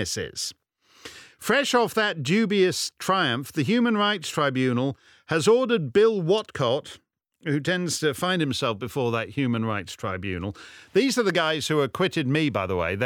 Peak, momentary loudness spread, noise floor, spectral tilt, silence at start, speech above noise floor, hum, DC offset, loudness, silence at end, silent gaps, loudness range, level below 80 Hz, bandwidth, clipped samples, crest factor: -8 dBFS; 11 LU; -48 dBFS; -4.5 dB/octave; 0 s; 23 dB; none; under 0.1%; -24 LUFS; 0 s; none; 4 LU; -60 dBFS; 19 kHz; under 0.1%; 18 dB